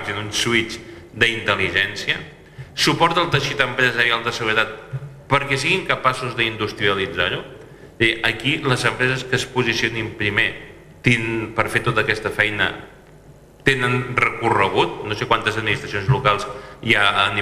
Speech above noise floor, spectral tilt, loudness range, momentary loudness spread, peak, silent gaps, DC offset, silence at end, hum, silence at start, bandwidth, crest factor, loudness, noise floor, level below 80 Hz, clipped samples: 25 dB; -4 dB/octave; 2 LU; 8 LU; -2 dBFS; none; under 0.1%; 0 s; none; 0 s; 14.5 kHz; 20 dB; -19 LUFS; -45 dBFS; -48 dBFS; under 0.1%